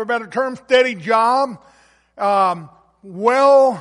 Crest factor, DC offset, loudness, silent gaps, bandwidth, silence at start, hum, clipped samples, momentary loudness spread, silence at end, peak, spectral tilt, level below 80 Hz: 14 dB; under 0.1%; -16 LUFS; none; 11 kHz; 0 s; none; under 0.1%; 11 LU; 0 s; -2 dBFS; -4.5 dB/octave; -64 dBFS